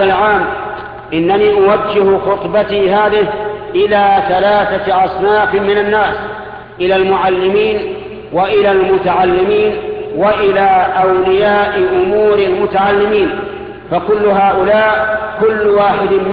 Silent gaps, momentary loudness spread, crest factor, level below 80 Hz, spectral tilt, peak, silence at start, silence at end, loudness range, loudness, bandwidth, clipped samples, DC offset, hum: none; 10 LU; 12 dB; -40 dBFS; -9 dB/octave; 0 dBFS; 0 s; 0 s; 2 LU; -12 LUFS; 5 kHz; under 0.1%; under 0.1%; none